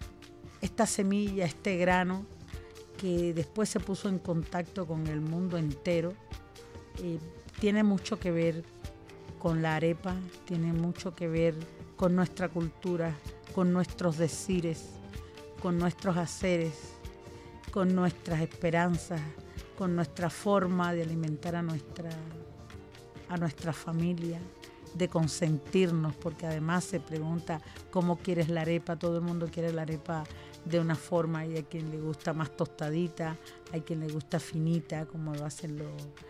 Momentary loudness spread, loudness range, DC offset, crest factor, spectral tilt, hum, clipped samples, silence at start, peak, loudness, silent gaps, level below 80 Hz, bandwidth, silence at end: 17 LU; 3 LU; under 0.1%; 18 dB; -6.5 dB/octave; none; under 0.1%; 0 s; -14 dBFS; -32 LUFS; none; -54 dBFS; 14 kHz; 0 s